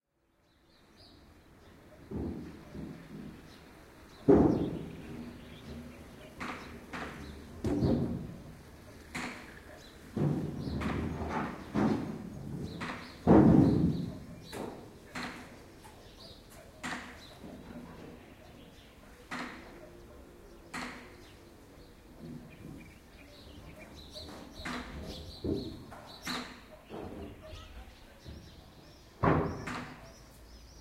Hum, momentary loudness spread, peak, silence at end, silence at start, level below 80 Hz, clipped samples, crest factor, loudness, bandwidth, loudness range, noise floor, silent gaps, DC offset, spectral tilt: none; 24 LU; -10 dBFS; 0 s; 1 s; -50 dBFS; under 0.1%; 26 dB; -33 LUFS; 16 kHz; 18 LU; -72 dBFS; none; under 0.1%; -7 dB/octave